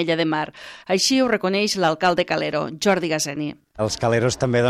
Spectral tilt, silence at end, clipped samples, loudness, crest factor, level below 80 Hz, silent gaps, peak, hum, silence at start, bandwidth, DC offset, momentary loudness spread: -4 dB/octave; 0 s; under 0.1%; -21 LUFS; 16 dB; -54 dBFS; none; -4 dBFS; none; 0 s; 15 kHz; under 0.1%; 9 LU